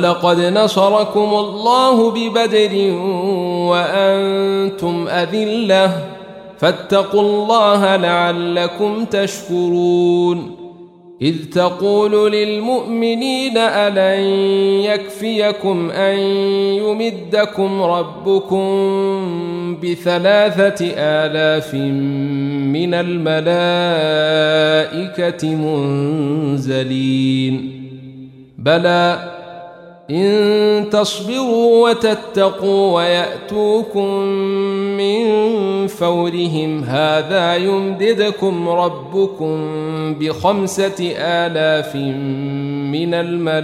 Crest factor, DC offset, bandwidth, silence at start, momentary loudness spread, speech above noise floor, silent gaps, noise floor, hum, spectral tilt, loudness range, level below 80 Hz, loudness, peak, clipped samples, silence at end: 14 dB; under 0.1%; 14.5 kHz; 0 s; 8 LU; 24 dB; none; -39 dBFS; none; -5.5 dB/octave; 3 LU; -60 dBFS; -16 LUFS; -2 dBFS; under 0.1%; 0 s